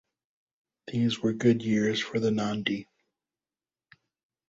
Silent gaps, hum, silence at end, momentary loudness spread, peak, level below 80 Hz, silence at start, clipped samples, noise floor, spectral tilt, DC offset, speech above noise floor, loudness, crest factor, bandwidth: none; none; 1.65 s; 7 LU; -10 dBFS; -66 dBFS; 0.85 s; under 0.1%; under -90 dBFS; -6 dB/octave; under 0.1%; over 63 dB; -28 LUFS; 20 dB; 8 kHz